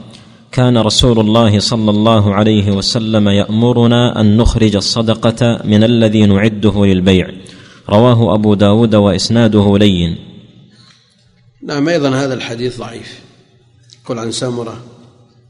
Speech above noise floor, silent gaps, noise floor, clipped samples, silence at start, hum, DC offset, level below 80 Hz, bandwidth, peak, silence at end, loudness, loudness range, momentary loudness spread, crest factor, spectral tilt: 39 dB; none; -50 dBFS; 0.8%; 0.05 s; none; under 0.1%; -30 dBFS; 11 kHz; 0 dBFS; 0.65 s; -11 LUFS; 9 LU; 12 LU; 12 dB; -6 dB/octave